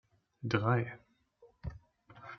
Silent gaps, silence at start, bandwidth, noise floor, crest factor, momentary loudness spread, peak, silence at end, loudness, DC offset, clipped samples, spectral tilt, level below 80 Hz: none; 0.4 s; 6.4 kHz; -66 dBFS; 24 dB; 21 LU; -14 dBFS; 0 s; -34 LUFS; under 0.1%; under 0.1%; -6 dB/octave; -58 dBFS